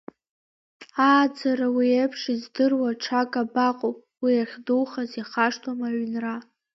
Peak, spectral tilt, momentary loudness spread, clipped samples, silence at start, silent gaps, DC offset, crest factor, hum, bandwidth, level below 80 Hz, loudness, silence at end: -6 dBFS; -4.5 dB/octave; 10 LU; under 0.1%; 0.8 s; none; under 0.1%; 18 dB; none; 7.2 kHz; -76 dBFS; -24 LUFS; 0.35 s